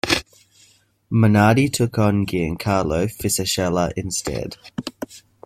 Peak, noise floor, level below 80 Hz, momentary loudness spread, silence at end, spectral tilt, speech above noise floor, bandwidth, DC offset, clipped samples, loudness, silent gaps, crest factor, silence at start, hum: -2 dBFS; -56 dBFS; -44 dBFS; 16 LU; 0.25 s; -5 dB/octave; 37 dB; 15.5 kHz; under 0.1%; under 0.1%; -20 LUFS; none; 18 dB; 0.05 s; none